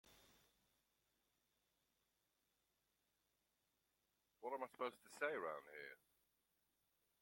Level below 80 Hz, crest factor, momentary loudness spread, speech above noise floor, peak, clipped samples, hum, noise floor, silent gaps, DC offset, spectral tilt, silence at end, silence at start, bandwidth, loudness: under -90 dBFS; 28 dB; 15 LU; 38 dB; -28 dBFS; under 0.1%; none; -88 dBFS; none; under 0.1%; -3.5 dB/octave; 1.25 s; 0.05 s; 16.5 kHz; -50 LUFS